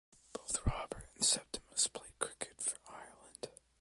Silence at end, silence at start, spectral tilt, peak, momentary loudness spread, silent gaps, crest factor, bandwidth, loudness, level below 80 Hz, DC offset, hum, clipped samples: 0.3 s; 0.35 s; -1.5 dB/octave; -14 dBFS; 19 LU; none; 26 dB; 12 kHz; -37 LUFS; -52 dBFS; under 0.1%; none; under 0.1%